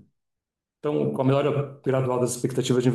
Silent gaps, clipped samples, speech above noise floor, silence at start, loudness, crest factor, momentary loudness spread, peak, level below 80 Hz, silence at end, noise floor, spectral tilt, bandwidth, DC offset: none; under 0.1%; 62 dB; 0.85 s; -25 LUFS; 16 dB; 5 LU; -8 dBFS; -68 dBFS; 0 s; -86 dBFS; -6.5 dB/octave; 12.5 kHz; under 0.1%